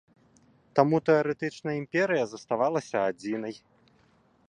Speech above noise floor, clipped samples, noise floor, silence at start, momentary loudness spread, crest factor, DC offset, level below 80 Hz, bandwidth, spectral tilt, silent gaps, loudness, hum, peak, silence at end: 37 dB; under 0.1%; -64 dBFS; 0.75 s; 10 LU; 24 dB; under 0.1%; -72 dBFS; 10 kHz; -6.5 dB/octave; none; -27 LUFS; none; -6 dBFS; 0.9 s